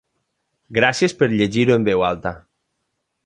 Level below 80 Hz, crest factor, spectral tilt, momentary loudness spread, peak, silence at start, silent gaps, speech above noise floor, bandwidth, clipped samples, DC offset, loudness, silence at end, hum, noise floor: -50 dBFS; 18 dB; -5.5 dB/octave; 9 LU; -2 dBFS; 0.7 s; none; 57 dB; 10.5 kHz; under 0.1%; under 0.1%; -18 LUFS; 0.85 s; none; -74 dBFS